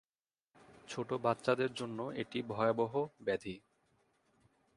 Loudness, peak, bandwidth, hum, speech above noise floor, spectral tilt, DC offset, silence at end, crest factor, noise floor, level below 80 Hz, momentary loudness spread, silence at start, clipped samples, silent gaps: -37 LUFS; -16 dBFS; 11.5 kHz; none; over 54 dB; -6 dB/octave; under 0.1%; 1.15 s; 22 dB; under -90 dBFS; -74 dBFS; 11 LU; 0.7 s; under 0.1%; none